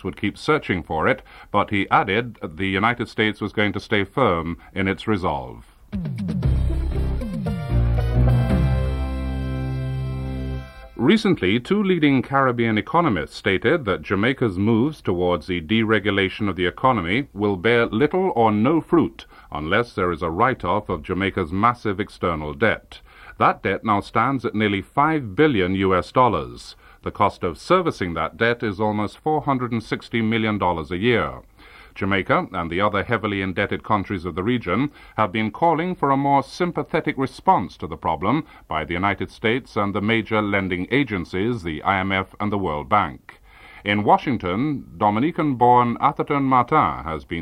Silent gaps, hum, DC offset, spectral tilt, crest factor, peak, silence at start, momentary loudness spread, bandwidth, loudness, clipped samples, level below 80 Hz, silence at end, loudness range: none; none; under 0.1%; -7.5 dB/octave; 18 dB; -2 dBFS; 0.05 s; 8 LU; 12.5 kHz; -21 LUFS; under 0.1%; -34 dBFS; 0 s; 3 LU